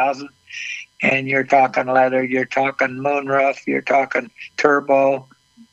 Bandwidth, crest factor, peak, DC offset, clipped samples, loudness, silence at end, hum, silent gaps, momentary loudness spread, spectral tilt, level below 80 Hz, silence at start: 8 kHz; 18 dB; 0 dBFS; under 0.1%; under 0.1%; -18 LUFS; 0.5 s; none; none; 12 LU; -5.5 dB/octave; -68 dBFS; 0 s